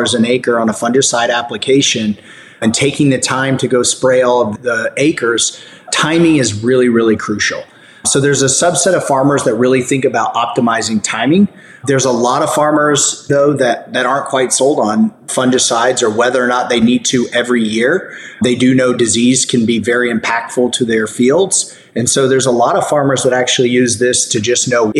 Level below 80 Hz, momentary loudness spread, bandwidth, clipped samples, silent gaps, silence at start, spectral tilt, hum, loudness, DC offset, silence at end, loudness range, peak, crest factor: -54 dBFS; 5 LU; 13 kHz; under 0.1%; none; 0 s; -3.5 dB/octave; none; -12 LUFS; under 0.1%; 0 s; 1 LU; -2 dBFS; 12 dB